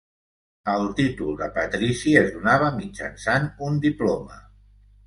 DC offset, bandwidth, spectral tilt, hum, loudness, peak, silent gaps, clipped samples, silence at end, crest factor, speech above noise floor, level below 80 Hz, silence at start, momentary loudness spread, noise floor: under 0.1%; 11.5 kHz; -6 dB/octave; 50 Hz at -45 dBFS; -23 LUFS; -4 dBFS; none; under 0.1%; 0.65 s; 20 dB; 30 dB; -48 dBFS; 0.65 s; 12 LU; -53 dBFS